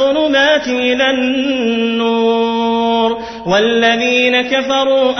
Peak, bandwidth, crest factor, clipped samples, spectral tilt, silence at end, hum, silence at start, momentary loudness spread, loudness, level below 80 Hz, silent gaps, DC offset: 0 dBFS; 6.4 kHz; 12 dB; under 0.1%; -4 dB/octave; 0 s; none; 0 s; 4 LU; -13 LUFS; -50 dBFS; none; under 0.1%